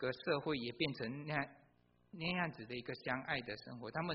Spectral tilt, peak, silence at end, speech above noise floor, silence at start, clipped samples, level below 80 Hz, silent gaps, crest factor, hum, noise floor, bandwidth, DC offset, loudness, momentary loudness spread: -3.5 dB/octave; -22 dBFS; 0 s; 25 dB; 0 s; under 0.1%; -72 dBFS; none; 20 dB; 60 Hz at -65 dBFS; -67 dBFS; 5.6 kHz; under 0.1%; -41 LUFS; 9 LU